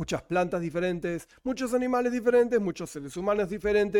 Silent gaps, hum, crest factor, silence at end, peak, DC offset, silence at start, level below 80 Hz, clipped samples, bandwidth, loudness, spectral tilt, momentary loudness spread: none; none; 14 dB; 0 s; -12 dBFS; under 0.1%; 0 s; -54 dBFS; under 0.1%; 16 kHz; -28 LUFS; -6 dB/octave; 11 LU